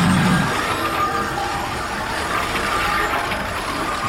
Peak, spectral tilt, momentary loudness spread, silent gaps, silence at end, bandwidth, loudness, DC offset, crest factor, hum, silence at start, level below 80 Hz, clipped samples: -6 dBFS; -4.5 dB/octave; 6 LU; none; 0 s; 16.5 kHz; -20 LUFS; under 0.1%; 14 dB; none; 0 s; -38 dBFS; under 0.1%